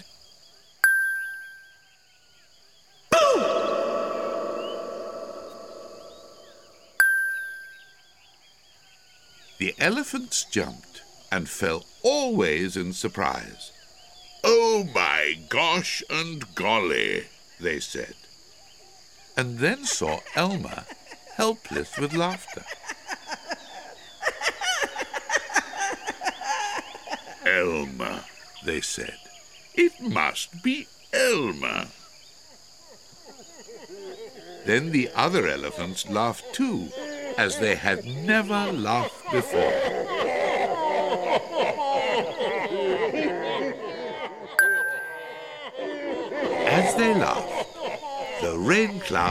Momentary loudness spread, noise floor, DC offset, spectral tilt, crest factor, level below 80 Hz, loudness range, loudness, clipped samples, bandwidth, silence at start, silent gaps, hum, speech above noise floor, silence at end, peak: 18 LU; -58 dBFS; 0.2%; -3.5 dB/octave; 24 dB; -58 dBFS; 5 LU; -25 LUFS; under 0.1%; 16 kHz; 0 s; none; none; 33 dB; 0 s; -4 dBFS